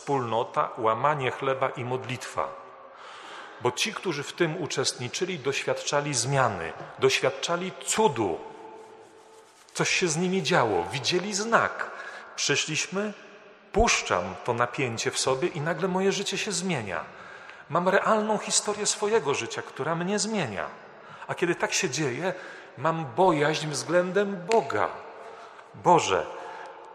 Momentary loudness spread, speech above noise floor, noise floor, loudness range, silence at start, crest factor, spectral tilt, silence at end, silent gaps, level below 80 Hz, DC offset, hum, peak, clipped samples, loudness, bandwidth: 18 LU; 26 dB; -53 dBFS; 3 LU; 0 s; 24 dB; -3.5 dB/octave; 0 s; none; -52 dBFS; under 0.1%; none; -4 dBFS; under 0.1%; -26 LUFS; 13 kHz